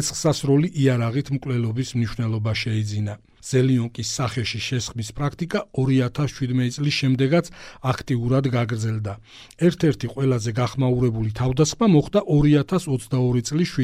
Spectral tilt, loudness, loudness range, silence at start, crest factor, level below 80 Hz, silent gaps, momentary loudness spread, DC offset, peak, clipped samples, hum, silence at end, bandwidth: -6 dB/octave; -22 LUFS; 4 LU; 0 s; 16 dB; -44 dBFS; none; 8 LU; under 0.1%; -6 dBFS; under 0.1%; none; 0 s; 14.5 kHz